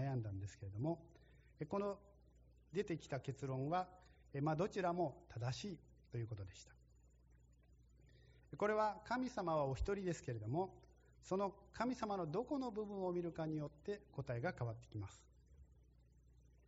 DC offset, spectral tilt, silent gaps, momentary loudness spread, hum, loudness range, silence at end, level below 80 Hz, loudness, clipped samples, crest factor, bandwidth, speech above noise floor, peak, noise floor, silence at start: under 0.1%; -6.5 dB/octave; none; 12 LU; none; 6 LU; 0.95 s; -64 dBFS; -44 LUFS; under 0.1%; 18 dB; 7.6 kHz; 26 dB; -26 dBFS; -69 dBFS; 0 s